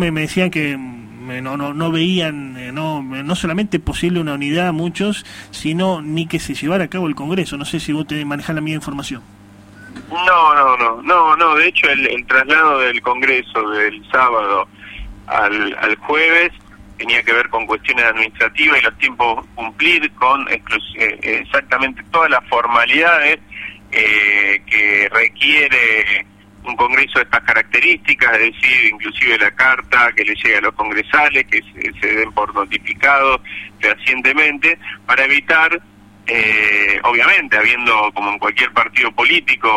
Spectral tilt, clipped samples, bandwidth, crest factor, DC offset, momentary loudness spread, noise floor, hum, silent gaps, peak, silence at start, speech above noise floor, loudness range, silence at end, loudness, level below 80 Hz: -4.5 dB/octave; under 0.1%; 16 kHz; 16 dB; under 0.1%; 12 LU; -40 dBFS; none; none; 0 dBFS; 0 s; 25 dB; 8 LU; 0 s; -14 LUFS; -44 dBFS